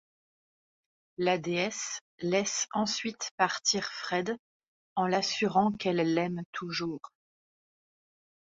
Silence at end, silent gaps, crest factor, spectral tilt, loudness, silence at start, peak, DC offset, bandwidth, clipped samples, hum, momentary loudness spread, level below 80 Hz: 1.5 s; 2.01-2.18 s, 3.31-3.38 s, 4.39-4.60 s, 4.67-4.96 s, 6.45-6.53 s; 22 dB; -3.5 dB/octave; -30 LUFS; 1.2 s; -12 dBFS; under 0.1%; 7.8 kHz; under 0.1%; none; 10 LU; -72 dBFS